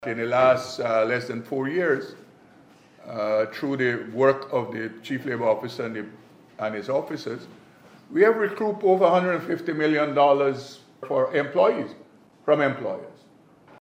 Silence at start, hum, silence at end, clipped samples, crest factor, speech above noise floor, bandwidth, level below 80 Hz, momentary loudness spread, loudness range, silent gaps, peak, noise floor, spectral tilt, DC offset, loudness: 0 s; none; 0.7 s; under 0.1%; 18 dB; 31 dB; 15.5 kHz; -74 dBFS; 13 LU; 5 LU; none; -6 dBFS; -54 dBFS; -6.5 dB/octave; under 0.1%; -24 LUFS